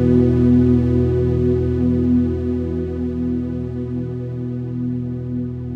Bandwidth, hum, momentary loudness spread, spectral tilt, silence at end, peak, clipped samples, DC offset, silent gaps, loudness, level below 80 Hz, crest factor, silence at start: 4.7 kHz; none; 11 LU; -11 dB/octave; 0 s; -2 dBFS; under 0.1%; under 0.1%; none; -19 LUFS; -32 dBFS; 16 dB; 0 s